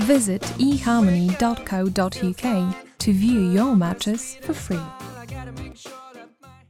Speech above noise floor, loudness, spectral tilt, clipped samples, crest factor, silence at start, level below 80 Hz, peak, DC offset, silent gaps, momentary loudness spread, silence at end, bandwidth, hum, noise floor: 27 dB; -21 LUFS; -5.5 dB/octave; under 0.1%; 18 dB; 0 s; -44 dBFS; -4 dBFS; under 0.1%; none; 18 LU; 0.2 s; 16 kHz; none; -47 dBFS